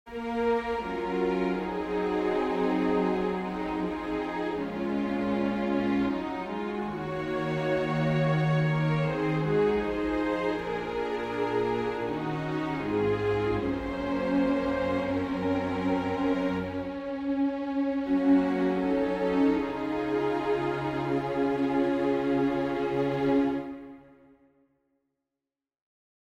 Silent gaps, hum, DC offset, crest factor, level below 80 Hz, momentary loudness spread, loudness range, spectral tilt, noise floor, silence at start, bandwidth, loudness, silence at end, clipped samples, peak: none; none; under 0.1%; 14 dB; -52 dBFS; 6 LU; 3 LU; -8 dB/octave; -90 dBFS; 0.05 s; 8.4 kHz; -28 LUFS; 2.25 s; under 0.1%; -14 dBFS